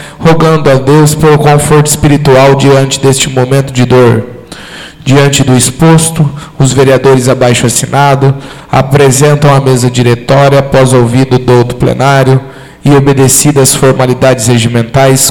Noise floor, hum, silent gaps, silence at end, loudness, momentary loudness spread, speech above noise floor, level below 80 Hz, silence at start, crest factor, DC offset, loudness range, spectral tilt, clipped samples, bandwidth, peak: -26 dBFS; none; none; 0 s; -6 LUFS; 6 LU; 21 dB; -30 dBFS; 0 s; 6 dB; under 0.1%; 2 LU; -5 dB/octave; 2%; 19 kHz; 0 dBFS